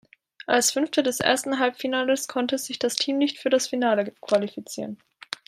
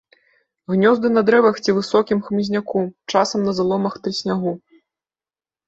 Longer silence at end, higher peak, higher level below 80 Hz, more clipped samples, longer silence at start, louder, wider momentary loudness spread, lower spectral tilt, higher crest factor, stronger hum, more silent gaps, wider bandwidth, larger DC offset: second, 0.15 s vs 1.1 s; about the same, -2 dBFS vs -2 dBFS; second, -72 dBFS vs -60 dBFS; neither; second, 0.5 s vs 0.7 s; second, -24 LUFS vs -19 LUFS; first, 13 LU vs 9 LU; second, -2.5 dB/octave vs -5.5 dB/octave; about the same, 22 dB vs 18 dB; neither; neither; first, 16 kHz vs 8 kHz; neither